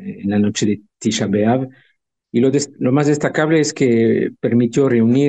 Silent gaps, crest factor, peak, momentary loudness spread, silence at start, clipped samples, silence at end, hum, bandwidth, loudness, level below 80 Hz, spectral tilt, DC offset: none; 14 dB; -2 dBFS; 6 LU; 0 s; under 0.1%; 0 s; none; 9.2 kHz; -17 LUFS; -58 dBFS; -6 dB/octave; under 0.1%